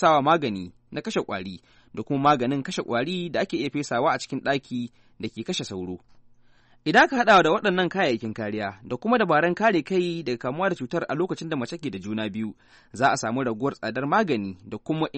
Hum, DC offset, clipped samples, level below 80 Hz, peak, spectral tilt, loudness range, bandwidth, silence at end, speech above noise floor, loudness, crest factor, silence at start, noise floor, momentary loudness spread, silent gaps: none; under 0.1%; under 0.1%; -62 dBFS; -6 dBFS; -5 dB/octave; 6 LU; 8.4 kHz; 0 s; 31 dB; -24 LUFS; 20 dB; 0 s; -56 dBFS; 16 LU; none